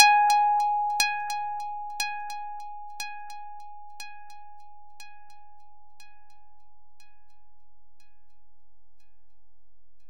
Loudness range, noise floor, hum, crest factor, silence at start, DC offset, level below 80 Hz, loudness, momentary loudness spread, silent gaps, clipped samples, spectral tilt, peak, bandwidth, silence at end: 27 LU; -72 dBFS; none; 26 dB; 0 s; 1%; -74 dBFS; -26 LUFS; 27 LU; none; under 0.1%; 2.5 dB/octave; -2 dBFS; 16.5 kHz; 5.05 s